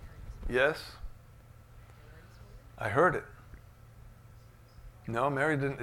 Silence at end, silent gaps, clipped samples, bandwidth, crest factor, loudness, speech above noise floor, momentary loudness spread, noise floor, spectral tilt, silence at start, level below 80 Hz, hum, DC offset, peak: 0 s; none; under 0.1%; 18.5 kHz; 22 dB; -30 LUFS; 25 dB; 27 LU; -55 dBFS; -6.5 dB/octave; 0 s; -50 dBFS; none; under 0.1%; -12 dBFS